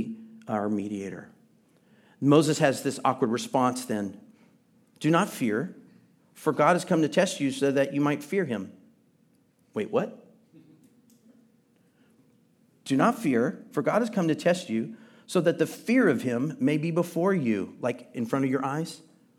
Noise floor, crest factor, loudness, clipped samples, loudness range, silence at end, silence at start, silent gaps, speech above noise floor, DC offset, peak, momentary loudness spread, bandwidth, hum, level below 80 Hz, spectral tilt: -65 dBFS; 22 dB; -27 LUFS; under 0.1%; 9 LU; 0.4 s; 0 s; none; 39 dB; under 0.1%; -6 dBFS; 12 LU; 16 kHz; none; -80 dBFS; -6 dB/octave